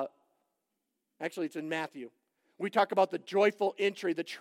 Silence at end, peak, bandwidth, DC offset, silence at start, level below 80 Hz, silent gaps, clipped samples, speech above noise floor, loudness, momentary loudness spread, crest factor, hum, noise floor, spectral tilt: 0 s; -14 dBFS; 15.5 kHz; under 0.1%; 0 s; under -90 dBFS; none; under 0.1%; 53 dB; -32 LUFS; 13 LU; 20 dB; none; -84 dBFS; -5 dB/octave